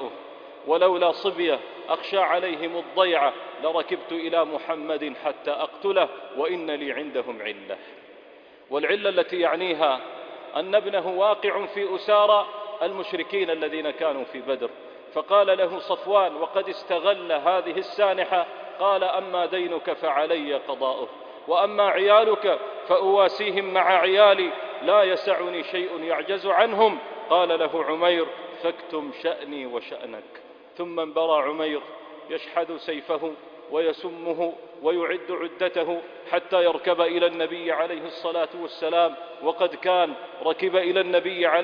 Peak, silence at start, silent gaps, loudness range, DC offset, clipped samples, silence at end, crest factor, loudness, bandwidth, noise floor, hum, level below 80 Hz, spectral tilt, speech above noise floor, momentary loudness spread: -4 dBFS; 0 s; none; 8 LU; under 0.1%; under 0.1%; 0 s; 20 dB; -24 LUFS; 5.2 kHz; -49 dBFS; none; -74 dBFS; -5.5 dB/octave; 26 dB; 12 LU